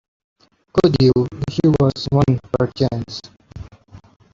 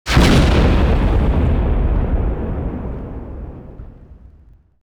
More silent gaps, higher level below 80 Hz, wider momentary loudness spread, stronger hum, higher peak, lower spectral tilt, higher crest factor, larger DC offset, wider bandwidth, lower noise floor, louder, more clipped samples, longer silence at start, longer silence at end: neither; second, -42 dBFS vs -18 dBFS; about the same, 18 LU vs 20 LU; neither; about the same, -2 dBFS vs 0 dBFS; first, -8 dB/octave vs -6.5 dB/octave; about the same, 16 dB vs 16 dB; neither; second, 7.6 kHz vs 13.5 kHz; about the same, -45 dBFS vs -47 dBFS; about the same, -18 LUFS vs -17 LUFS; neither; first, 0.75 s vs 0.05 s; second, 0.35 s vs 0.8 s